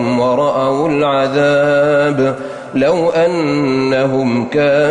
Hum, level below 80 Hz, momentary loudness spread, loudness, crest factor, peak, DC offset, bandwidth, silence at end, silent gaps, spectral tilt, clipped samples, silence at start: none; -50 dBFS; 4 LU; -14 LUFS; 10 dB; -4 dBFS; under 0.1%; 10 kHz; 0 s; none; -6.5 dB/octave; under 0.1%; 0 s